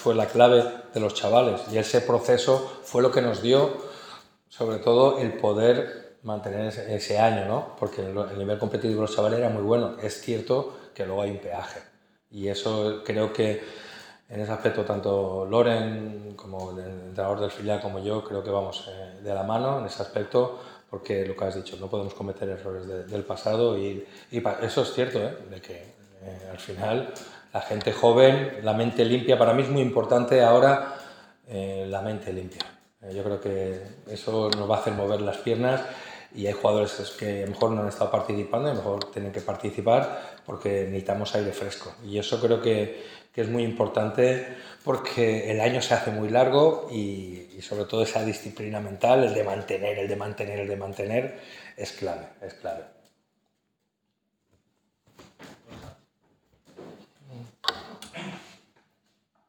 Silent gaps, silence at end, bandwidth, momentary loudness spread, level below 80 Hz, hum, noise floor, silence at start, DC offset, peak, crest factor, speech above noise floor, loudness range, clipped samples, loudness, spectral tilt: none; 1.05 s; 16.5 kHz; 18 LU; -70 dBFS; none; -78 dBFS; 0 s; under 0.1%; -2 dBFS; 24 dB; 52 dB; 10 LU; under 0.1%; -26 LUFS; -5.5 dB/octave